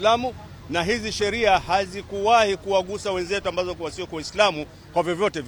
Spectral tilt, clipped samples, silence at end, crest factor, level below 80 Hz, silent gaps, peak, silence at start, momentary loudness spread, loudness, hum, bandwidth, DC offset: -4 dB/octave; under 0.1%; 0 s; 18 dB; -46 dBFS; none; -4 dBFS; 0 s; 12 LU; -23 LUFS; none; 19 kHz; under 0.1%